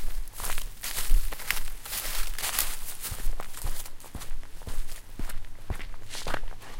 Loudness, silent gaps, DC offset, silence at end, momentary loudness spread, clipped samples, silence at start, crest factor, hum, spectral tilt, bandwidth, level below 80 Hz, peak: -34 LUFS; none; under 0.1%; 0 s; 13 LU; under 0.1%; 0 s; 22 dB; none; -2 dB/octave; 17 kHz; -32 dBFS; -4 dBFS